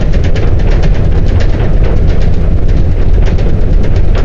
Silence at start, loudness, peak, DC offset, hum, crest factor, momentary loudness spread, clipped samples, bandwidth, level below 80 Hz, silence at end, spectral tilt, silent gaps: 0 s; -12 LUFS; 0 dBFS; under 0.1%; none; 6 dB; 1 LU; under 0.1%; 6.8 kHz; -8 dBFS; 0 s; -8 dB/octave; none